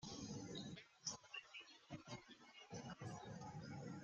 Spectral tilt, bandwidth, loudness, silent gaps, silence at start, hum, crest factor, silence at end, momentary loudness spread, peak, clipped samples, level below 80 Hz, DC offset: -4 dB/octave; 8.8 kHz; -54 LUFS; none; 0 s; none; 22 dB; 0 s; 8 LU; -32 dBFS; under 0.1%; -78 dBFS; under 0.1%